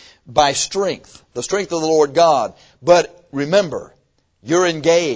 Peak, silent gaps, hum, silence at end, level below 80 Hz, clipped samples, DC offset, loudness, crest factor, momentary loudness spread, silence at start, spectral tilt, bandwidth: 0 dBFS; none; none; 0 s; -52 dBFS; under 0.1%; under 0.1%; -17 LUFS; 18 dB; 13 LU; 0.3 s; -3.5 dB/octave; 8 kHz